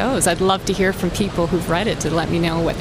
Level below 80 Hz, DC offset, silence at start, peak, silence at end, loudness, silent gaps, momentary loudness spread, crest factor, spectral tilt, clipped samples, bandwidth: -34 dBFS; under 0.1%; 0 s; -2 dBFS; 0 s; -19 LUFS; none; 4 LU; 16 dB; -4.5 dB/octave; under 0.1%; 16.5 kHz